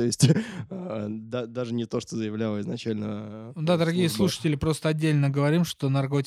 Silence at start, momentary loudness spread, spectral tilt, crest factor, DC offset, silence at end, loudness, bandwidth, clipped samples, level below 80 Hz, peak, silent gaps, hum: 0 s; 10 LU; -6 dB/octave; 18 dB; under 0.1%; 0 s; -26 LUFS; 15 kHz; under 0.1%; -54 dBFS; -6 dBFS; none; none